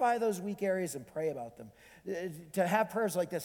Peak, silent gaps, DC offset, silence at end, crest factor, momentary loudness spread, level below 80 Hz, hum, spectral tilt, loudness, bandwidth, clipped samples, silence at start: -14 dBFS; none; under 0.1%; 0 s; 20 dB; 17 LU; -72 dBFS; none; -5 dB/octave; -34 LUFS; 19 kHz; under 0.1%; 0 s